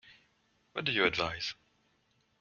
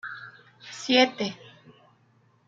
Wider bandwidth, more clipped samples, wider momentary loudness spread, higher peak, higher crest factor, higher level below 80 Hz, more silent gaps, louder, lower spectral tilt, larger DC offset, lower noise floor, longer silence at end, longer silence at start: about the same, 7.2 kHz vs 7.8 kHz; neither; second, 14 LU vs 25 LU; second, -10 dBFS vs -6 dBFS; about the same, 26 dB vs 24 dB; first, -64 dBFS vs -78 dBFS; neither; second, -32 LUFS vs -24 LUFS; about the same, -4 dB/octave vs -3 dB/octave; neither; first, -73 dBFS vs -63 dBFS; second, 0.85 s vs 1.15 s; about the same, 0.05 s vs 0.05 s